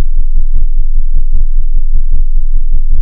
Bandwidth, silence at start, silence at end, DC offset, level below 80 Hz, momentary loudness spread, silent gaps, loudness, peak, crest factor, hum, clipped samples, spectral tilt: 0.3 kHz; 0 s; 0 s; under 0.1%; -6 dBFS; 1 LU; none; -18 LUFS; 0 dBFS; 4 dB; none; 4%; -13.5 dB/octave